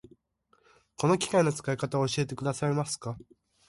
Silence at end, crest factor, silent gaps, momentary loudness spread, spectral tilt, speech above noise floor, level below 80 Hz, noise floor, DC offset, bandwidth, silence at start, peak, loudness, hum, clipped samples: 0.5 s; 18 dB; none; 10 LU; -5 dB/octave; 41 dB; -64 dBFS; -70 dBFS; under 0.1%; 11.5 kHz; 1 s; -12 dBFS; -29 LUFS; none; under 0.1%